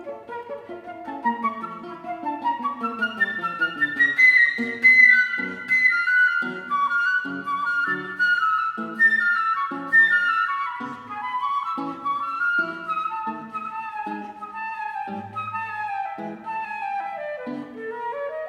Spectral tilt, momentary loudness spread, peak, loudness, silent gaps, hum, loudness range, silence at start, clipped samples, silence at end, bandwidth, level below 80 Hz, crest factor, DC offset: -4 dB/octave; 18 LU; -4 dBFS; -21 LUFS; none; none; 14 LU; 0 s; under 0.1%; 0 s; 12.5 kHz; -72 dBFS; 20 dB; under 0.1%